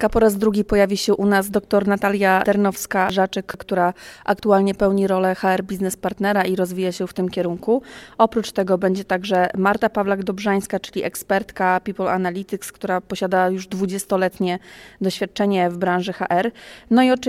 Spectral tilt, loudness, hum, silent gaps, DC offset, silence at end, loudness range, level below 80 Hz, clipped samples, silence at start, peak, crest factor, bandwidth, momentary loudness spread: -5.5 dB/octave; -20 LUFS; none; none; under 0.1%; 0 s; 4 LU; -46 dBFS; under 0.1%; 0 s; -2 dBFS; 18 dB; 16 kHz; 8 LU